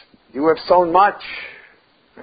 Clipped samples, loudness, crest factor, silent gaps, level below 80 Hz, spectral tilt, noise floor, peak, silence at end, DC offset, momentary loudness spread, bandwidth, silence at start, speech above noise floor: under 0.1%; -16 LUFS; 18 dB; none; -54 dBFS; -10 dB/octave; -54 dBFS; 0 dBFS; 0.7 s; under 0.1%; 19 LU; 5 kHz; 0.35 s; 38 dB